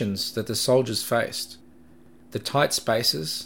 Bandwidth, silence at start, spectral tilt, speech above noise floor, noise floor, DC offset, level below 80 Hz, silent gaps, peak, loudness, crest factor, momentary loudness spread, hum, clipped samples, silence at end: 17 kHz; 0 s; -3.5 dB/octave; 28 dB; -53 dBFS; 0.2%; -62 dBFS; none; -6 dBFS; -24 LUFS; 20 dB; 11 LU; none; under 0.1%; 0 s